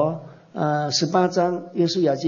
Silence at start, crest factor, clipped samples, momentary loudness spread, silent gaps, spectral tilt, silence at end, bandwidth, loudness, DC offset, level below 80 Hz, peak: 0 s; 16 dB; under 0.1%; 9 LU; none; -5 dB/octave; 0 s; 7.6 kHz; -22 LUFS; under 0.1%; -70 dBFS; -6 dBFS